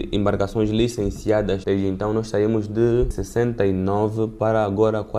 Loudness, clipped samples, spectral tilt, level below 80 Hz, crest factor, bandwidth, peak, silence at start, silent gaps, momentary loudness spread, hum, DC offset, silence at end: -21 LUFS; under 0.1%; -7 dB/octave; -36 dBFS; 16 dB; 13.5 kHz; -6 dBFS; 0 s; none; 3 LU; none; under 0.1%; 0 s